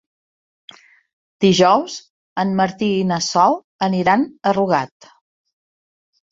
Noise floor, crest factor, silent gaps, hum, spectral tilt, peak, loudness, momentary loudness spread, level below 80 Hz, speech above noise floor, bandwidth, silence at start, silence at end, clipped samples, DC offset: under -90 dBFS; 18 dB; 2.10-2.36 s, 3.64-3.79 s; none; -5 dB/octave; -2 dBFS; -17 LUFS; 11 LU; -58 dBFS; over 73 dB; 7.8 kHz; 1.4 s; 1.45 s; under 0.1%; under 0.1%